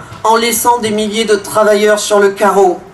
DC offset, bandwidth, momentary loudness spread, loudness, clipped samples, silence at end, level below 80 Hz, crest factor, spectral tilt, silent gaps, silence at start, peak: under 0.1%; 14 kHz; 4 LU; -11 LUFS; under 0.1%; 0.05 s; -48 dBFS; 10 dB; -3 dB/octave; none; 0 s; 0 dBFS